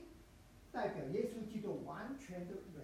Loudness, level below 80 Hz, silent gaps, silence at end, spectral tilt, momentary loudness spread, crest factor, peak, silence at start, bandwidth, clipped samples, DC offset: -44 LUFS; -66 dBFS; none; 0 s; -7 dB/octave; 20 LU; 18 dB; -26 dBFS; 0 s; 16 kHz; under 0.1%; under 0.1%